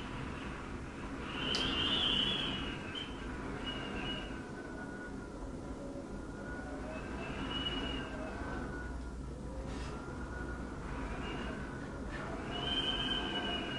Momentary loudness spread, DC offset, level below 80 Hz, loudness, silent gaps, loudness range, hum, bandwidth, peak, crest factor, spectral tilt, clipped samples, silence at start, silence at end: 12 LU; under 0.1%; -48 dBFS; -38 LUFS; none; 8 LU; none; 11.5 kHz; -20 dBFS; 20 dB; -4.5 dB/octave; under 0.1%; 0 s; 0 s